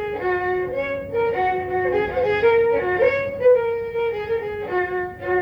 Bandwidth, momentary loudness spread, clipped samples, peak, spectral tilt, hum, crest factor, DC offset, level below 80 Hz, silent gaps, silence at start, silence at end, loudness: 5.8 kHz; 8 LU; under 0.1%; -6 dBFS; -7.5 dB/octave; none; 14 dB; under 0.1%; -48 dBFS; none; 0 s; 0 s; -21 LUFS